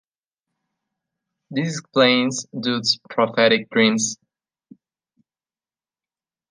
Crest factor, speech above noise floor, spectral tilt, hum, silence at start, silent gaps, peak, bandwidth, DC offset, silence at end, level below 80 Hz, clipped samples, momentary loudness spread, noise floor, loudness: 22 dB; over 70 dB; -3.5 dB/octave; none; 1.5 s; none; -2 dBFS; 10 kHz; under 0.1%; 2.35 s; -72 dBFS; under 0.1%; 9 LU; under -90 dBFS; -19 LUFS